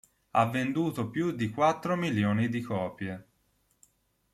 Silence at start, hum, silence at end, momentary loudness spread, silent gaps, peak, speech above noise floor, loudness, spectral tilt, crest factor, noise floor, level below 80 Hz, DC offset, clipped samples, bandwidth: 0.35 s; none; 1.1 s; 9 LU; none; -12 dBFS; 43 dB; -29 LUFS; -7 dB/octave; 20 dB; -71 dBFS; -68 dBFS; under 0.1%; under 0.1%; 14.5 kHz